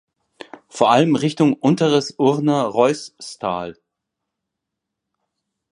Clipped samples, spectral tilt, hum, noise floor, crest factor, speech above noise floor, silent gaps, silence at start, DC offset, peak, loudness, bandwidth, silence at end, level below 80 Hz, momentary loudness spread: under 0.1%; -6 dB/octave; none; -81 dBFS; 20 dB; 64 dB; none; 0.75 s; under 0.1%; 0 dBFS; -18 LUFS; 11 kHz; 2 s; -64 dBFS; 13 LU